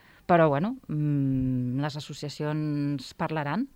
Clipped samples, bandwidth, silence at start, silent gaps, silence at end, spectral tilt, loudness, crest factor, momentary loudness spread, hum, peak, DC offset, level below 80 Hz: under 0.1%; 11 kHz; 0.3 s; none; 0.1 s; -7.5 dB/octave; -28 LUFS; 18 dB; 11 LU; none; -10 dBFS; under 0.1%; -54 dBFS